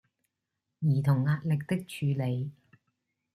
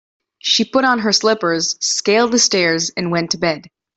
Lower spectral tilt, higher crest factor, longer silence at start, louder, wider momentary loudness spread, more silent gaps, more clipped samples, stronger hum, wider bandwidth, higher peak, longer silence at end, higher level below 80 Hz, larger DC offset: first, -8 dB/octave vs -2.5 dB/octave; about the same, 16 dB vs 16 dB; first, 0.8 s vs 0.45 s; second, -30 LUFS vs -15 LUFS; about the same, 8 LU vs 7 LU; neither; neither; neither; first, 14 kHz vs 8.4 kHz; second, -14 dBFS vs -2 dBFS; first, 0.85 s vs 0.3 s; second, -68 dBFS vs -60 dBFS; neither